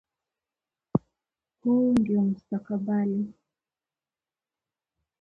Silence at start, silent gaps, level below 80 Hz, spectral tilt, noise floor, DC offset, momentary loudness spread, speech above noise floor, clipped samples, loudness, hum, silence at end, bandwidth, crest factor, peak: 0.95 s; none; -64 dBFS; -9.5 dB/octave; under -90 dBFS; under 0.1%; 10 LU; over 65 dB; under 0.1%; -27 LUFS; none; 1.9 s; 5.8 kHz; 20 dB; -10 dBFS